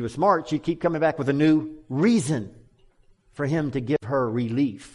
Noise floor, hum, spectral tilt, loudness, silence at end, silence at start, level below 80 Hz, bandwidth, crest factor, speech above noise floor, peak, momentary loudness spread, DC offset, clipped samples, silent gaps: -58 dBFS; none; -7 dB/octave; -24 LUFS; 0.05 s; 0 s; -56 dBFS; 11.5 kHz; 16 dB; 35 dB; -8 dBFS; 7 LU; under 0.1%; under 0.1%; none